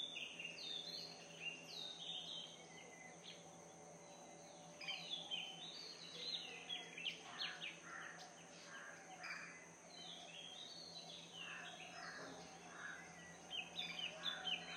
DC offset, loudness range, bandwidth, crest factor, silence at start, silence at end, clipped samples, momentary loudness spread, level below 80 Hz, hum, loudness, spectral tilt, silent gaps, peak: under 0.1%; 5 LU; 16 kHz; 20 dB; 0 s; 0 s; under 0.1%; 12 LU; -88 dBFS; none; -50 LUFS; -1.5 dB/octave; none; -32 dBFS